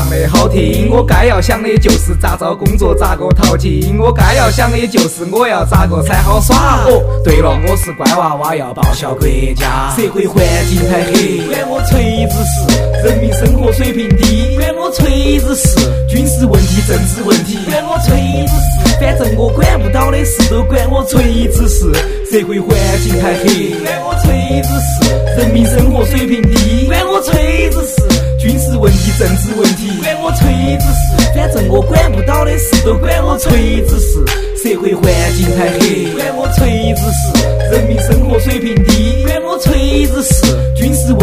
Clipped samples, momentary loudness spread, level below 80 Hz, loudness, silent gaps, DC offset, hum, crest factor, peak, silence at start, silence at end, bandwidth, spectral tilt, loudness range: 0.3%; 4 LU; -14 dBFS; -11 LUFS; none; 0.2%; none; 10 dB; 0 dBFS; 0 s; 0 s; 16.5 kHz; -5.5 dB/octave; 2 LU